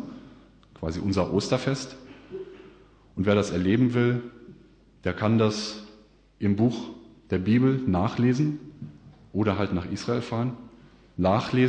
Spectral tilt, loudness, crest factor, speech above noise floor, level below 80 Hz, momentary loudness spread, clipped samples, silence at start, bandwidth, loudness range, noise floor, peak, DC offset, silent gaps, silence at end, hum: -7 dB/octave; -26 LUFS; 18 dB; 30 dB; -54 dBFS; 19 LU; under 0.1%; 0 s; 9.4 kHz; 3 LU; -55 dBFS; -10 dBFS; under 0.1%; none; 0 s; none